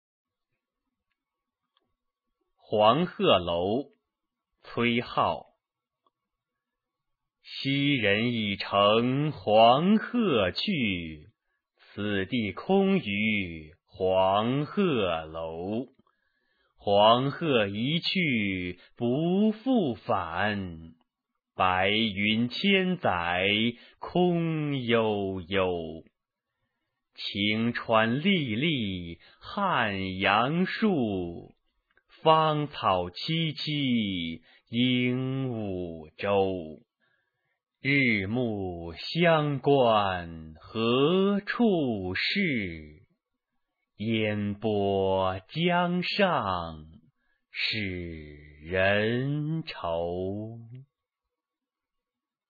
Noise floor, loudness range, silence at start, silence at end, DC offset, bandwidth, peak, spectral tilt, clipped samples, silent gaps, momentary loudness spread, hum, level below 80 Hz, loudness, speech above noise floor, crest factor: under -90 dBFS; 5 LU; 2.7 s; 1.65 s; under 0.1%; 5 kHz; -6 dBFS; -8 dB/octave; under 0.1%; none; 14 LU; none; -60 dBFS; -27 LUFS; over 63 dB; 22 dB